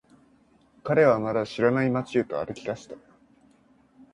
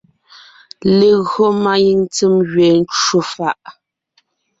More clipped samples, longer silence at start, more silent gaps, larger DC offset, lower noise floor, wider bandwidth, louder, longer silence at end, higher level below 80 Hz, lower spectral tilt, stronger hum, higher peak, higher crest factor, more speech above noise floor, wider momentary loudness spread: neither; about the same, 0.85 s vs 0.85 s; neither; neither; about the same, -61 dBFS vs -62 dBFS; first, 10.5 kHz vs 8 kHz; second, -25 LUFS vs -14 LUFS; first, 1.15 s vs 0.9 s; second, -62 dBFS vs -54 dBFS; first, -7 dB/octave vs -5 dB/octave; neither; second, -6 dBFS vs -2 dBFS; first, 20 dB vs 12 dB; second, 36 dB vs 48 dB; first, 18 LU vs 9 LU